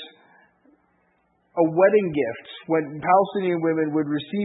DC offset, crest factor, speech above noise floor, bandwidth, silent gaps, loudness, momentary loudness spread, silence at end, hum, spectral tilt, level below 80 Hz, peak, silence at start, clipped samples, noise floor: under 0.1%; 18 dB; 45 dB; 4 kHz; none; -22 LUFS; 11 LU; 0 s; none; -11 dB/octave; -66 dBFS; -6 dBFS; 0 s; under 0.1%; -66 dBFS